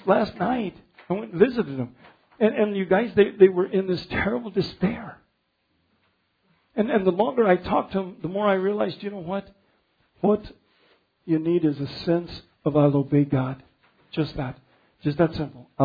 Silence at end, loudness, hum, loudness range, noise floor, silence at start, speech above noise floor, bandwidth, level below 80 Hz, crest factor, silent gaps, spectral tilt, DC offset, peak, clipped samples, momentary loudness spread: 0 s; -24 LUFS; none; 5 LU; -71 dBFS; 0.05 s; 49 dB; 5 kHz; -54 dBFS; 20 dB; none; -9.5 dB/octave; under 0.1%; -4 dBFS; under 0.1%; 13 LU